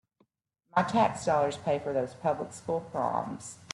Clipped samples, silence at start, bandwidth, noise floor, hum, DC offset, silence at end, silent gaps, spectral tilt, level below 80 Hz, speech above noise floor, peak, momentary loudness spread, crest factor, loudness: under 0.1%; 0.75 s; 12 kHz; -75 dBFS; none; under 0.1%; 0.1 s; none; -5.5 dB/octave; -68 dBFS; 46 dB; -12 dBFS; 8 LU; 20 dB; -30 LUFS